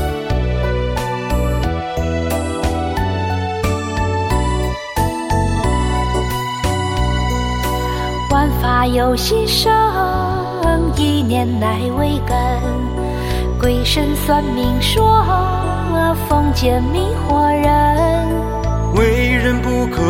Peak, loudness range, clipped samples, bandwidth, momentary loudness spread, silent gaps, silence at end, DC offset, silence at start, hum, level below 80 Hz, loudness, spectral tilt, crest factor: -2 dBFS; 4 LU; under 0.1%; 16.5 kHz; 6 LU; none; 0 s; under 0.1%; 0 s; none; -22 dBFS; -17 LUFS; -5.5 dB/octave; 14 dB